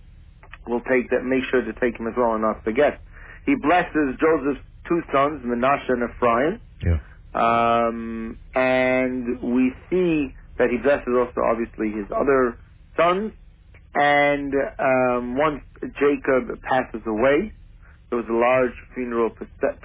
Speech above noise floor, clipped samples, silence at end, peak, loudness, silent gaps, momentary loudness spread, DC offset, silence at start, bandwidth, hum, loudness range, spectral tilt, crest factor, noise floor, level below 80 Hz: 26 dB; under 0.1%; 0.1 s; -6 dBFS; -22 LUFS; none; 9 LU; under 0.1%; 0.5 s; 4 kHz; none; 2 LU; -10 dB/octave; 16 dB; -48 dBFS; -40 dBFS